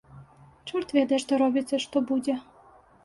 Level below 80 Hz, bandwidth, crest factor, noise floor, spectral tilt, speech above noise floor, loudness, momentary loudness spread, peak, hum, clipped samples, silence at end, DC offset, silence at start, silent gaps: -66 dBFS; 11.5 kHz; 16 dB; -55 dBFS; -4.5 dB/octave; 30 dB; -26 LUFS; 9 LU; -10 dBFS; none; under 0.1%; 0.65 s; under 0.1%; 0.15 s; none